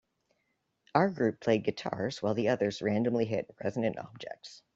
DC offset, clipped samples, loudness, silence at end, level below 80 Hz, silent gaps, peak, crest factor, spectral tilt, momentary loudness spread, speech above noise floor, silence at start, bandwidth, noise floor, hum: under 0.1%; under 0.1%; -31 LUFS; 0.15 s; -70 dBFS; none; -8 dBFS; 24 dB; -6.5 dB/octave; 14 LU; 48 dB; 0.95 s; 7.8 kHz; -79 dBFS; none